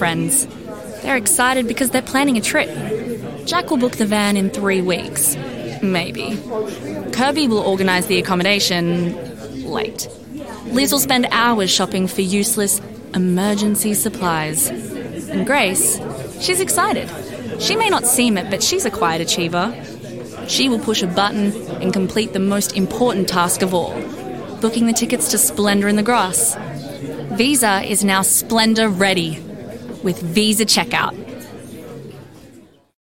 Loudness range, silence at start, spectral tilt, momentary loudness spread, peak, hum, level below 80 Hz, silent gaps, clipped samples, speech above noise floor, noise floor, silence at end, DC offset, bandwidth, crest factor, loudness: 3 LU; 0 s; -3 dB/octave; 15 LU; -2 dBFS; none; -50 dBFS; none; under 0.1%; 28 dB; -46 dBFS; 0.45 s; 0.3%; 17 kHz; 16 dB; -17 LUFS